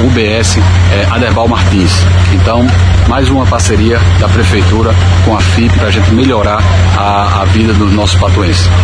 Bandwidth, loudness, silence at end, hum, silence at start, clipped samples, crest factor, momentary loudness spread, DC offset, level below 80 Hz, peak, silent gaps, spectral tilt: 10.5 kHz; -8 LUFS; 0 s; none; 0 s; 0.3%; 8 dB; 1 LU; under 0.1%; -18 dBFS; 0 dBFS; none; -5.5 dB/octave